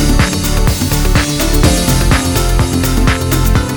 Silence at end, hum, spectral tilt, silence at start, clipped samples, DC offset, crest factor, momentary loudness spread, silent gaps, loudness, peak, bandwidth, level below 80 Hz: 0 s; none; -4.5 dB/octave; 0 s; under 0.1%; under 0.1%; 10 dB; 3 LU; none; -12 LUFS; 0 dBFS; over 20 kHz; -14 dBFS